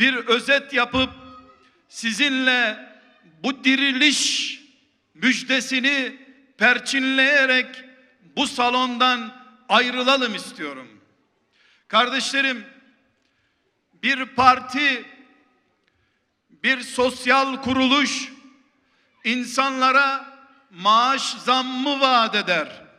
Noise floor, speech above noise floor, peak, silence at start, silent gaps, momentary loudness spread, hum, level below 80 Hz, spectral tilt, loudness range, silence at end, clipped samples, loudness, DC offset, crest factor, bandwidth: -69 dBFS; 49 dB; 0 dBFS; 0 s; none; 12 LU; none; -60 dBFS; -2 dB/octave; 3 LU; 0.2 s; under 0.1%; -19 LUFS; under 0.1%; 22 dB; 13.5 kHz